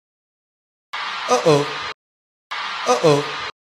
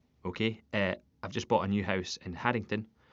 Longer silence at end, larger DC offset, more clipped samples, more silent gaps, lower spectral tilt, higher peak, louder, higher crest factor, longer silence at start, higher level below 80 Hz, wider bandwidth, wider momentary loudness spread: about the same, 0.15 s vs 0.25 s; neither; neither; first, 1.94-2.50 s vs none; about the same, -4 dB/octave vs -4 dB/octave; first, 0 dBFS vs -10 dBFS; first, -20 LUFS vs -33 LUFS; about the same, 22 dB vs 24 dB; first, 0.95 s vs 0.25 s; about the same, -66 dBFS vs -62 dBFS; first, 13 kHz vs 7.6 kHz; first, 15 LU vs 9 LU